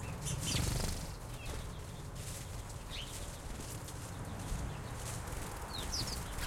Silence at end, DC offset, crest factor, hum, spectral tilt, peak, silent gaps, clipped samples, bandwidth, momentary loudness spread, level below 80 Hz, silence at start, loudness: 0 s; under 0.1%; 20 dB; none; -3.5 dB/octave; -22 dBFS; none; under 0.1%; 16.5 kHz; 10 LU; -46 dBFS; 0 s; -41 LUFS